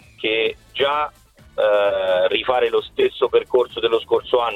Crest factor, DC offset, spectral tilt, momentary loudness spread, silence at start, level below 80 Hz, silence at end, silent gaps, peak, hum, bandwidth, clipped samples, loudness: 16 dB; under 0.1%; -5 dB/octave; 4 LU; 0.2 s; -54 dBFS; 0 s; none; -4 dBFS; none; 10.5 kHz; under 0.1%; -19 LUFS